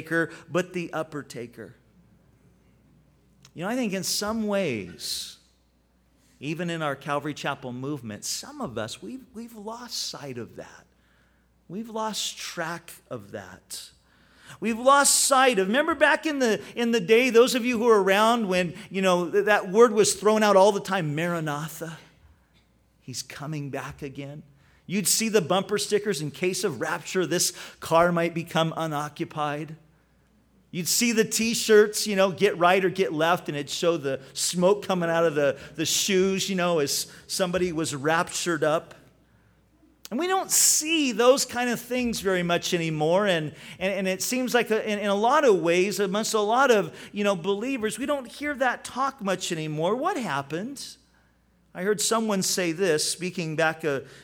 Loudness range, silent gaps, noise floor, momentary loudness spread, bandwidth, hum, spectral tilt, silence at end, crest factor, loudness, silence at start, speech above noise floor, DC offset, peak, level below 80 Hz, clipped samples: 13 LU; none; -64 dBFS; 17 LU; over 20 kHz; none; -3.5 dB/octave; 0 s; 20 dB; -24 LUFS; 0 s; 40 dB; under 0.1%; -6 dBFS; -62 dBFS; under 0.1%